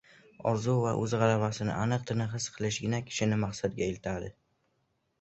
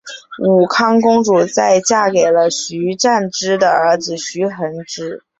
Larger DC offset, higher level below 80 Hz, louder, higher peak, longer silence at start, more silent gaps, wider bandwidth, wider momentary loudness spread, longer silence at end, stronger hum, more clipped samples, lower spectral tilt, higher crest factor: neither; about the same, -58 dBFS vs -58 dBFS; second, -31 LUFS vs -14 LUFS; second, -12 dBFS vs -2 dBFS; first, 0.4 s vs 0.05 s; neither; about the same, 8.2 kHz vs 8.2 kHz; second, 8 LU vs 11 LU; first, 0.9 s vs 0.25 s; neither; neither; first, -5.5 dB/octave vs -4 dB/octave; first, 20 dB vs 12 dB